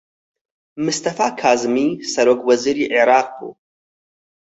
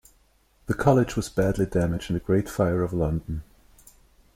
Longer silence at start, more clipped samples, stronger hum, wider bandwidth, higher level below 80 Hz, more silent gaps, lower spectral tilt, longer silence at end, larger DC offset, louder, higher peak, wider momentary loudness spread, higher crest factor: about the same, 0.75 s vs 0.7 s; neither; neither; second, 8.2 kHz vs 16.5 kHz; second, -64 dBFS vs -42 dBFS; neither; second, -3.5 dB/octave vs -7 dB/octave; about the same, 0.9 s vs 0.95 s; neither; first, -17 LUFS vs -25 LUFS; first, -2 dBFS vs -6 dBFS; about the same, 11 LU vs 11 LU; about the same, 18 dB vs 20 dB